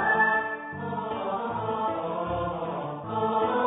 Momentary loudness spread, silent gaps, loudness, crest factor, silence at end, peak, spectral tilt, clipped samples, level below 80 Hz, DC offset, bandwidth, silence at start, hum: 10 LU; none; -28 LUFS; 16 dB; 0 s; -12 dBFS; -10 dB/octave; under 0.1%; -54 dBFS; under 0.1%; 4 kHz; 0 s; none